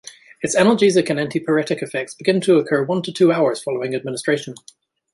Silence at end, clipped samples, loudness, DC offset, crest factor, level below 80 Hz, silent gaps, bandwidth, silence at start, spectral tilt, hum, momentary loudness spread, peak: 0.6 s; under 0.1%; -19 LUFS; under 0.1%; 16 dB; -64 dBFS; none; 11.5 kHz; 0.05 s; -5 dB/octave; none; 8 LU; -2 dBFS